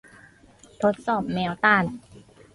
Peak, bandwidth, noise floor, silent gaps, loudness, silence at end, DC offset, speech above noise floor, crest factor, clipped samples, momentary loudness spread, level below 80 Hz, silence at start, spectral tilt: -4 dBFS; 11.5 kHz; -53 dBFS; none; -23 LUFS; 0.35 s; under 0.1%; 30 dB; 20 dB; under 0.1%; 10 LU; -58 dBFS; 0.8 s; -6.5 dB/octave